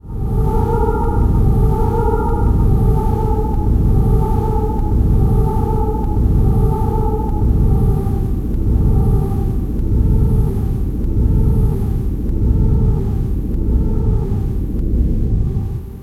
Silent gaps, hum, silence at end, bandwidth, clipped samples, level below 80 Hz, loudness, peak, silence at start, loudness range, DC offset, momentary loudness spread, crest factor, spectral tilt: none; none; 0 s; 14 kHz; under 0.1%; -16 dBFS; -17 LUFS; -2 dBFS; 0.05 s; 2 LU; under 0.1%; 5 LU; 12 dB; -10.5 dB/octave